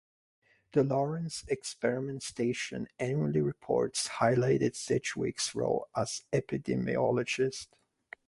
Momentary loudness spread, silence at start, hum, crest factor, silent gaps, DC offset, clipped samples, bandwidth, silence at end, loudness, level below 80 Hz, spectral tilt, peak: 8 LU; 0.75 s; none; 20 dB; none; under 0.1%; under 0.1%; 11.5 kHz; 0.65 s; -32 LUFS; -64 dBFS; -5 dB/octave; -12 dBFS